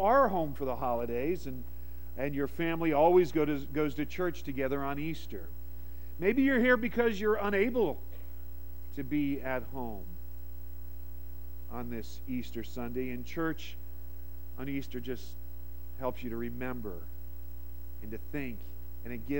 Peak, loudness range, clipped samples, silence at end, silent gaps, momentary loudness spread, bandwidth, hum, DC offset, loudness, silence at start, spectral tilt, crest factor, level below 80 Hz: -14 dBFS; 11 LU; under 0.1%; 0 s; none; 21 LU; 16.5 kHz; none; 1%; -32 LUFS; 0 s; -7 dB/octave; 20 dB; -46 dBFS